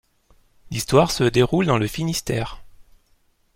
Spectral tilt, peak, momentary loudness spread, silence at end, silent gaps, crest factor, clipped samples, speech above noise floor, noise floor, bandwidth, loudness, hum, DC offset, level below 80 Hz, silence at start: -5.5 dB/octave; -4 dBFS; 11 LU; 0.75 s; none; 20 dB; under 0.1%; 42 dB; -61 dBFS; 16.5 kHz; -20 LUFS; none; under 0.1%; -44 dBFS; 0.7 s